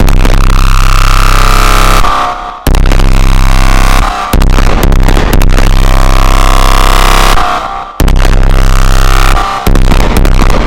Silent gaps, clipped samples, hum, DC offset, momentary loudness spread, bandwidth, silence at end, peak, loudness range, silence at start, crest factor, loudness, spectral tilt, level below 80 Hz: none; 20%; none; 20%; 4 LU; 16.5 kHz; 0 s; 0 dBFS; 1 LU; 0 s; 4 dB; -9 LUFS; -4.5 dB/octave; -6 dBFS